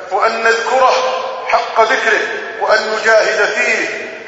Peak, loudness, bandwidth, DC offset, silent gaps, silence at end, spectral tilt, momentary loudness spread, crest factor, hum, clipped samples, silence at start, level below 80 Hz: 0 dBFS; -13 LUFS; 8 kHz; under 0.1%; none; 0 s; -1 dB/octave; 7 LU; 14 dB; none; under 0.1%; 0 s; -58 dBFS